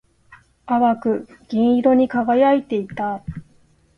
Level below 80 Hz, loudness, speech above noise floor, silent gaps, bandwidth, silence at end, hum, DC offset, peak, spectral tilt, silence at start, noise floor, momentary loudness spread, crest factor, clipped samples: -52 dBFS; -19 LUFS; 38 dB; none; 5.8 kHz; 0.55 s; none; under 0.1%; -4 dBFS; -8.5 dB/octave; 0.3 s; -56 dBFS; 11 LU; 16 dB; under 0.1%